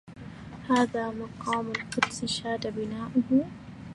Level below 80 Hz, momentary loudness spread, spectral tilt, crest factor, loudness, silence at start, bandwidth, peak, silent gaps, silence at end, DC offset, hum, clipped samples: -58 dBFS; 17 LU; -4.5 dB/octave; 22 dB; -29 LUFS; 0.05 s; 11.5 kHz; -8 dBFS; none; 0 s; under 0.1%; none; under 0.1%